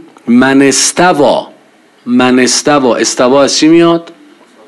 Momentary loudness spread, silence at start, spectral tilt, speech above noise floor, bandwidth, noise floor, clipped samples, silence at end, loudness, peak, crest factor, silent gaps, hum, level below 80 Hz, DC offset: 6 LU; 0.25 s; -3.5 dB/octave; 36 dB; 12.5 kHz; -44 dBFS; 0.4%; 0.55 s; -8 LUFS; 0 dBFS; 8 dB; none; none; -48 dBFS; under 0.1%